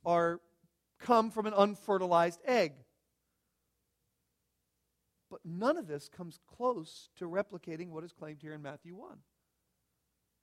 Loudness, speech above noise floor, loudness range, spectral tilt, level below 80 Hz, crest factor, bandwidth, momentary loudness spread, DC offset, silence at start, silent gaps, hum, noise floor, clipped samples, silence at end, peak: -33 LUFS; 48 dB; 12 LU; -6 dB/octave; -78 dBFS; 24 dB; 14.5 kHz; 20 LU; under 0.1%; 0.05 s; none; none; -82 dBFS; under 0.1%; 1.3 s; -12 dBFS